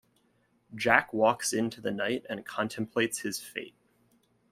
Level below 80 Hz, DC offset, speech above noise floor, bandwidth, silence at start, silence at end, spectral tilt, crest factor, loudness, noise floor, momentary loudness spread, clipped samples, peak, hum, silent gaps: -68 dBFS; under 0.1%; 40 dB; 16 kHz; 0.7 s; 0.8 s; -3.5 dB/octave; 28 dB; -29 LUFS; -70 dBFS; 15 LU; under 0.1%; -4 dBFS; none; none